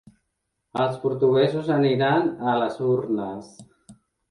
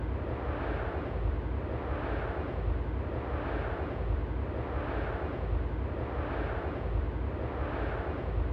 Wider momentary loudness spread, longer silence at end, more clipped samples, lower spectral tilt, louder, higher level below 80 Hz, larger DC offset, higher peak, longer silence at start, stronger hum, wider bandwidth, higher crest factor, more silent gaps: first, 9 LU vs 1 LU; first, 0.35 s vs 0 s; neither; second, -7.5 dB/octave vs -9.5 dB/octave; first, -23 LUFS vs -35 LUFS; second, -64 dBFS vs -36 dBFS; neither; first, -8 dBFS vs -20 dBFS; first, 0.75 s vs 0 s; neither; first, 11 kHz vs 5 kHz; about the same, 16 dB vs 12 dB; neither